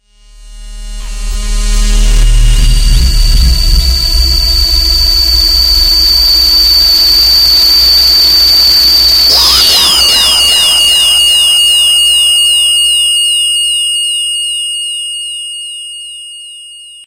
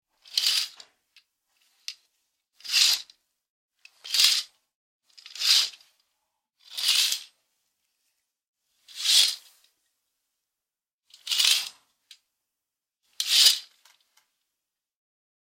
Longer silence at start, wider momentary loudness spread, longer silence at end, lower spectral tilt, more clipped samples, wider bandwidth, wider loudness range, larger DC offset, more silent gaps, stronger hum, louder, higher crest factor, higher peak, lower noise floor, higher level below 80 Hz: about the same, 0.4 s vs 0.35 s; second, 15 LU vs 22 LU; second, 0.05 s vs 1.85 s; first, -0.5 dB/octave vs 6 dB/octave; first, 0.2% vs under 0.1%; about the same, 17 kHz vs 16.5 kHz; first, 9 LU vs 5 LU; neither; second, none vs 3.50-3.69 s, 4.75-5.00 s, 8.48-8.54 s, 10.93-10.99 s; neither; first, -5 LUFS vs -22 LUFS; second, 8 dB vs 28 dB; about the same, 0 dBFS vs -2 dBFS; second, -35 dBFS vs -90 dBFS; first, -14 dBFS vs -88 dBFS